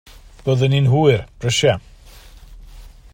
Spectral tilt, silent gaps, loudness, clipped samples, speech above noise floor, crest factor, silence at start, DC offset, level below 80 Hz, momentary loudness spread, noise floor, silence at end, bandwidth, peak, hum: -5.5 dB/octave; none; -17 LUFS; under 0.1%; 26 dB; 18 dB; 0.45 s; under 0.1%; -42 dBFS; 9 LU; -42 dBFS; 0.25 s; 15 kHz; -2 dBFS; none